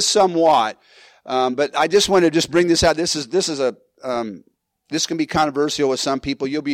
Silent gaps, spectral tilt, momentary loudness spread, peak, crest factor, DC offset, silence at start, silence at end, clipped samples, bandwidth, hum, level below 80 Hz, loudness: none; -3.5 dB/octave; 10 LU; -6 dBFS; 14 dB; under 0.1%; 0 s; 0 s; under 0.1%; 16 kHz; none; -46 dBFS; -19 LUFS